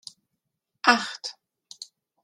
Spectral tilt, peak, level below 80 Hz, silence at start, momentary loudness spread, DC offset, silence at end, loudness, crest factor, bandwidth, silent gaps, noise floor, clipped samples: -1.5 dB/octave; -2 dBFS; -78 dBFS; 0.85 s; 23 LU; under 0.1%; 0.4 s; -23 LUFS; 28 dB; 13.5 kHz; none; -81 dBFS; under 0.1%